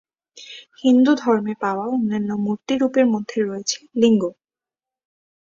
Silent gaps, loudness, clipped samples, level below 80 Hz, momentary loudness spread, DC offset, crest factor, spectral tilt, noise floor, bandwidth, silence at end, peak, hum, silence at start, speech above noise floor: none; -20 LUFS; under 0.1%; -66 dBFS; 10 LU; under 0.1%; 16 dB; -5 dB/octave; under -90 dBFS; 7.6 kHz; 1.25 s; -4 dBFS; none; 0.35 s; over 71 dB